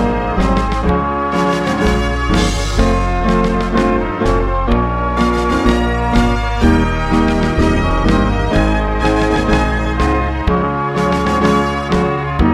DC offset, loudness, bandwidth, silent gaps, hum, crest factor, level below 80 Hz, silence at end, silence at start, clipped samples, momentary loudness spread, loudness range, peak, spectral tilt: under 0.1%; -15 LUFS; 12.5 kHz; none; none; 14 dB; -20 dBFS; 0 s; 0 s; under 0.1%; 2 LU; 1 LU; 0 dBFS; -6.5 dB/octave